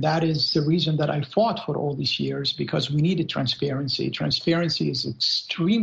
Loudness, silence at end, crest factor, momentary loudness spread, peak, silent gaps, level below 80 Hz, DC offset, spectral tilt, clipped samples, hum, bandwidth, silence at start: -23 LUFS; 0 s; 16 dB; 4 LU; -8 dBFS; none; -58 dBFS; under 0.1%; -6 dB/octave; under 0.1%; none; 7.8 kHz; 0 s